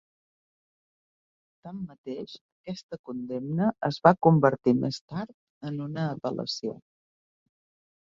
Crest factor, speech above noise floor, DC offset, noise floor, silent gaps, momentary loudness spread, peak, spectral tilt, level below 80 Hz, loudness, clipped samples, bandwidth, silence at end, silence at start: 26 dB; over 63 dB; under 0.1%; under -90 dBFS; 1.98-2.04 s, 2.41-2.64 s, 2.83-2.89 s, 2.99-3.04 s, 5.01-5.08 s, 5.34-5.61 s; 20 LU; -2 dBFS; -7 dB/octave; -66 dBFS; -27 LUFS; under 0.1%; 7.6 kHz; 1.25 s; 1.65 s